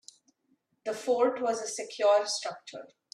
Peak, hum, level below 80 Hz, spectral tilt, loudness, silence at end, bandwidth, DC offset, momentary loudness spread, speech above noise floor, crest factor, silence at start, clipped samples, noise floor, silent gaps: -14 dBFS; none; -84 dBFS; -1.5 dB/octave; -29 LUFS; 0.3 s; 13 kHz; under 0.1%; 18 LU; 44 dB; 18 dB; 0.85 s; under 0.1%; -73 dBFS; none